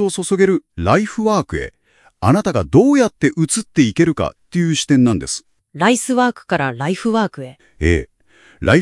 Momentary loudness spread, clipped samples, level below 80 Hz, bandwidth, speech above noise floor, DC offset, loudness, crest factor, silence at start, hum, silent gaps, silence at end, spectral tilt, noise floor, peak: 9 LU; under 0.1%; -40 dBFS; 12 kHz; 35 dB; under 0.1%; -17 LUFS; 16 dB; 0 s; none; none; 0 s; -5.5 dB/octave; -51 dBFS; 0 dBFS